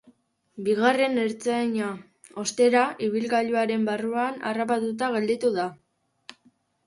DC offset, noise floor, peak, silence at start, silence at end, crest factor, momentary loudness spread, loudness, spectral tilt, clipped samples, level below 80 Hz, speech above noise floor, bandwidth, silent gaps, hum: under 0.1%; -64 dBFS; -8 dBFS; 0.55 s; 1.1 s; 18 dB; 10 LU; -25 LUFS; -4.5 dB/octave; under 0.1%; -72 dBFS; 39 dB; 11.5 kHz; none; none